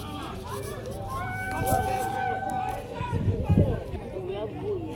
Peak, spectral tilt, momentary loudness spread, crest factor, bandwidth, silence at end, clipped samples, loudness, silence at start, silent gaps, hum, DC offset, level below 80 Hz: -8 dBFS; -6.5 dB/octave; 11 LU; 20 dB; 18 kHz; 0 s; under 0.1%; -30 LUFS; 0 s; none; none; under 0.1%; -40 dBFS